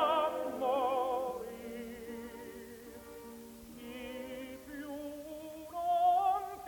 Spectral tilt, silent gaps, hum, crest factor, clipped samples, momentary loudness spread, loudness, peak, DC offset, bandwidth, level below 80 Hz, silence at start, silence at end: -4 dB/octave; none; none; 20 dB; under 0.1%; 19 LU; -36 LUFS; -18 dBFS; under 0.1%; 19 kHz; -66 dBFS; 0 s; 0 s